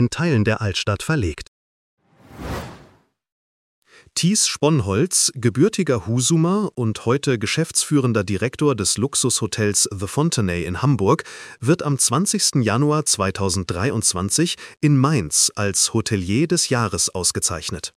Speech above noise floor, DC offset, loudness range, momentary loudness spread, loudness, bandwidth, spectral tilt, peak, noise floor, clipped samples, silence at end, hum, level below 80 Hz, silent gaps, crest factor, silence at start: 34 dB; under 0.1%; 6 LU; 6 LU; -19 LUFS; 16 kHz; -4 dB/octave; -2 dBFS; -54 dBFS; under 0.1%; 0.1 s; none; -46 dBFS; 1.48-1.97 s, 3.32-3.82 s; 18 dB; 0 s